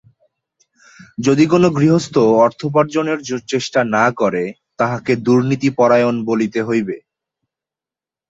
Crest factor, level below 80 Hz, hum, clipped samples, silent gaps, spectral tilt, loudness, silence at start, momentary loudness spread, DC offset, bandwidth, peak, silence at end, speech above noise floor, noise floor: 16 dB; -56 dBFS; none; under 0.1%; none; -6.5 dB/octave; -16 LUFS; 1.2 s; 8 LU; under 0.1%; 8 kHz; -2 dBFS; 1.3 s; 74 dB; -89 dBFS